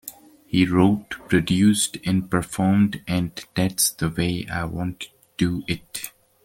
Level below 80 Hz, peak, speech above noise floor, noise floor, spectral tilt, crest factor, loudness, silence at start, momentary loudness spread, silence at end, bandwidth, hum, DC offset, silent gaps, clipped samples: -48 dBFS; -4 dBFS; 21 dB; -43 dBFS; -4.5 dB/octave; 18 dB; -22 LUFS; 0.05 s; 13 LU; 0.35 s; 17 kHz; none; under 0.1%; none; under 0.1%